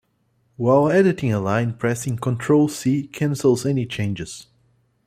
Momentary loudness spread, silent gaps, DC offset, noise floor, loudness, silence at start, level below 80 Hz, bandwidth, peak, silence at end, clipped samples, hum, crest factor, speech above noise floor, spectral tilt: 9 LU; none; under 0.1%; -66 dBFS; -20 LUFS; 0.6 s; -56 dBFS; 15 kHz; -4 dBFS; 0.65 s; under 0.1%; none; 18 dB; 46 dB; -6.5 dB/octave